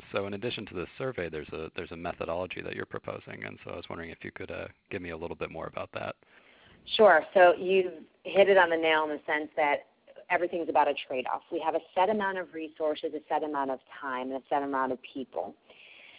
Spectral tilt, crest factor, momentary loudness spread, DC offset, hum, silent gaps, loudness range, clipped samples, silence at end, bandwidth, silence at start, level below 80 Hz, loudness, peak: -2.5 dB/octave; 22 dB; 18 LU; under 0.1%; none; none; 14 LU; under 0.1%; 0.1 s; 4 kHz; 0.05 s; -62 dBFS; -29 LUFS; -8 dBFS